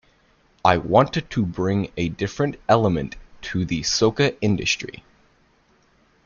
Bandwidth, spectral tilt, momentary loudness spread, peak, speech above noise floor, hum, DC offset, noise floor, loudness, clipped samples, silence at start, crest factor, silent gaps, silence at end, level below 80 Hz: 7.4 kHz; -5 dB/octave; 9 LU; -2 dBFS; 39 dB; none; under 0.1%; -60 dBFS; -21 LUFS; under 0.1%; 0.65 s; 22 dB; none; 1.35 s; -48 dBFS